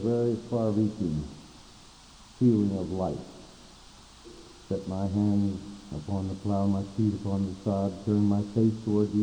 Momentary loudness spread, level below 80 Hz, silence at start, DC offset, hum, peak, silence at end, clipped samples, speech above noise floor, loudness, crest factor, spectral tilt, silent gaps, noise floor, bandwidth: 19 LU; -54 dBFS; 0 s; under 0.1%; none; -12 dBFS; 0 s; under 0.1%; 25 dB; -29 LUFS; 16 dB; -8.5 dB/octave; none; -52 dBFS; 9.8 kHz